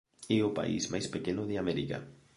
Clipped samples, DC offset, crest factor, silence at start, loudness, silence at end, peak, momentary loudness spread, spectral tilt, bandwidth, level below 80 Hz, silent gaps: under 0.1%; under 0.1%; 18 dB; 0.2 s; -33 LUFS; 0.25 s; -16 dBFS; 6 LU; -5 dB/octave; 11.5 kHz; -60 dBFS; none